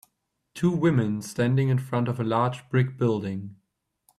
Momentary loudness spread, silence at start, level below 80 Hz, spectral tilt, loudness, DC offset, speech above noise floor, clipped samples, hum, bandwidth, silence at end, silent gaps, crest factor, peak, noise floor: 10 LU; 0.55 s; -62 dBFS; -7.5 dB/octave; -25 LUFS; under 0.1%; 52 dB; under 0.1%; none; 13 kHz; 0.65 s; none; 16 dB; -10 dBFS; -76 dBFS